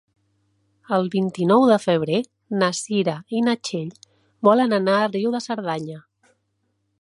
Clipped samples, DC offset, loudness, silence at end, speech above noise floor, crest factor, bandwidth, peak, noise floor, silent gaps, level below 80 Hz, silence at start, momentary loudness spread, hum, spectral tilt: under 0.1%; under 0.1%; -21 LUFS; 1 s; 51 dB; 20 dB; 11.5 kHz; -2 dBFS; -71 dBFS; none; -70 dBFS; 0.9 s; 12 LU; none; -5.5 dB/octave